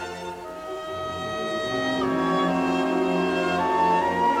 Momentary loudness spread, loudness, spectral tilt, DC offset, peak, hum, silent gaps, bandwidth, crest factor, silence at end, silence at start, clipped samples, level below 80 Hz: 12 LU; -24 LUFS; -5.5 dB/octave; under 0.1%; -12 dBFS; none; none; 15.5 kHz; 14 dB; 0 s; 0 s; under 0.1%; -58 dBFS